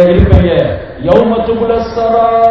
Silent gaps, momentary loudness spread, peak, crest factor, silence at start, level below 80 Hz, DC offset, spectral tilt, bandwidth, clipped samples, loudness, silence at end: none; 5 LU; 0 dBFS; 8 dB; 0 s; -18 dBFS; 0.4%; -9 dB/octave; 6 kHz; 2%; -10 LUFS; 0 s